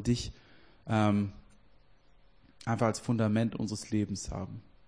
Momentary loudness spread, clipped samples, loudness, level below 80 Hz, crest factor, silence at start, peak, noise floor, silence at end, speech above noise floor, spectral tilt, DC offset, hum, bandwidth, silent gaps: 13 LU; under 0.1%; -32 LUFS; -54 dBFS; 20 dB; 0 s; -14 dBFS; -64 dBFS; 0.25 s; 33 dB; -6 dB/octave; under 0.1%; none; 10.5 kHz; none